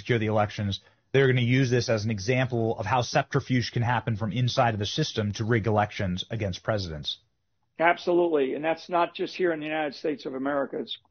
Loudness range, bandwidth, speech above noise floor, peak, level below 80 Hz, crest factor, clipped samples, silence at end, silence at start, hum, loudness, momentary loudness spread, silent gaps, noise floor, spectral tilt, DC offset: 2 LU; 6.6 kHz; 50 dB; -4 dBFS; -56 dBFS; 22 dB; under 0.1%; 0.15 s; 0 s; none; -27 LUFS; 8 LU; none; -76 dBFS; -5 dB/octave; under 0.1%